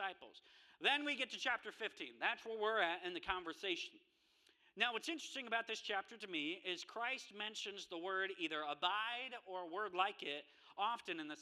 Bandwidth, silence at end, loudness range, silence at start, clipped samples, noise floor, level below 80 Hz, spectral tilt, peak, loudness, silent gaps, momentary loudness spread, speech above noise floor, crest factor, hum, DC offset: 14 kHz; 0 s; 3 LU; 0 s; under 0.1%; -74 dBFS; -80 dBFS; -2 dB/octave; -20 dBFS; -42 LUFS; none; 9 LU; 32 dB; 24 dB; none; under 0.1%